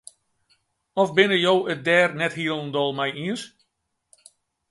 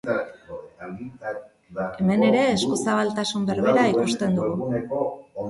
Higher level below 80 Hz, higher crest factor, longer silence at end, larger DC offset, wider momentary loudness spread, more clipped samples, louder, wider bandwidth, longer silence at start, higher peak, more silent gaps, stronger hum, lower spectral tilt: second, -70 dBFS vs -58 dBFS; first, 22 dB vs 16 dB; first, 1.25 s vs 0 s; neither; second, 12 LU vs 18 LU; neither; about the same, -22 LUFS vs -23 LUFS; about the same, 11.5 kHz vs 11.5 kHz; first, 0.95 s vs 0.05 s; first, -2 dBFS vs -6 dBFS; neither; neither; about the same, -5 dB/octave vs -5.5 dB/octave